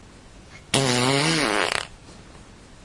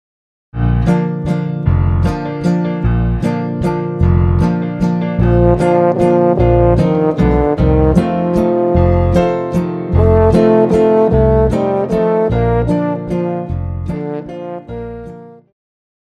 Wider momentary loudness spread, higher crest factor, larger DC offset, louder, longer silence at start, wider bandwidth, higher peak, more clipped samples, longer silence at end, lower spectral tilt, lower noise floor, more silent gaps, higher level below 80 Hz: second, 7 LU vs 11 LU; first, 22 dB vs 14 dB; neither; second, -21 LUFS vs -14 LUFS; second, 0.05 s vs 0.55 s; first, 11.5 kHz vs 10 kHz; about the same, -2 dBFS vs 0 dBFS; neither; second, 0.1 s vs 0.7 s; second, -3.5 dB/octave vs -9.5 dB/octave; first, -46 dBFS vs -33 dBFS; neither; second, -50 dBFS vs -24 dBFS